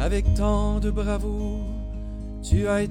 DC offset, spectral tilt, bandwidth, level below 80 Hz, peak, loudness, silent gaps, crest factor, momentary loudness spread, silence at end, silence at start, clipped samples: under 0.1%; -7 dB/octave; 10.5 kHz; -26 dBFS; -8 dBFS; -26 LUFS; none; 14 dB; 12 LU; 0 s; 0 s; under 0.1%